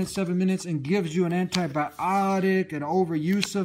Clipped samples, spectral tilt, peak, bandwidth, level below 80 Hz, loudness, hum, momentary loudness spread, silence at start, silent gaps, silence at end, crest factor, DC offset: under 0.1%; -6 dB/octave; -6 dBFS; 15.5 kHz; -62 dBFS; -25 LUFS; none; 3 LU; 0 s; none; 0 s; 20 dB; under 0.1%